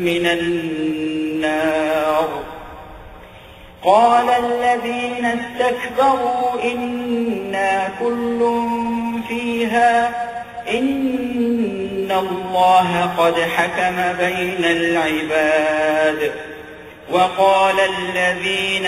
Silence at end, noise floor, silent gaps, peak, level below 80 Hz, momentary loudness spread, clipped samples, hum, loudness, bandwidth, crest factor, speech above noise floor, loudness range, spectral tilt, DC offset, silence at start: 0 s; -40 dBFS; none; -2 dBFS; -50 dBFS; 9 LU; under 0.1%; none; -18 LUFS; 15.5 kHz; 16 dB; 23 dB; 3 LU; -4.5 dB/octave; under 0.1%; 0 s